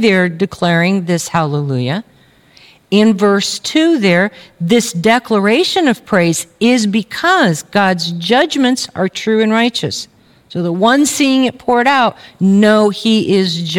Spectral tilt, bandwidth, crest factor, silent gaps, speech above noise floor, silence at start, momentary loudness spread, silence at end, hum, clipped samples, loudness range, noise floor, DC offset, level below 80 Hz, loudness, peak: -4.5 dB/octave; 17 kHz; 12 dB; none; 34 dB; 0 s; 7 LU; 0 s; none; under 0.1%; 2 LU; -46 dBFS; under 0.1%; -56 dBFS; -13 LUFS; 0 dBFS